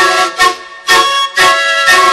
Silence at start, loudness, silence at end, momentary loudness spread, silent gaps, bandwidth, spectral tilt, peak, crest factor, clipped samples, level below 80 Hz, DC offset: 0 s; -8 LUFS; 0 s; 4 LU; none; 16.5 kHz; 0 dB/octave; 0 dBFS; 10 dB; 0.2%; -46 dBFS; under 0.1%